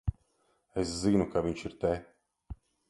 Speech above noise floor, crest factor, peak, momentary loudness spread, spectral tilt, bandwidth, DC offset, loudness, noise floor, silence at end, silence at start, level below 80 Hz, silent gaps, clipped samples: 43 dB; 20 dB; -12 dBFS; 22 LU; -6.5 dB/octave; 11.5 kHz; under 0.1%; -32 LUFS; -73 dBFS; 0.35 s; 0.05 s; -46 dBFS; none; under 0.1%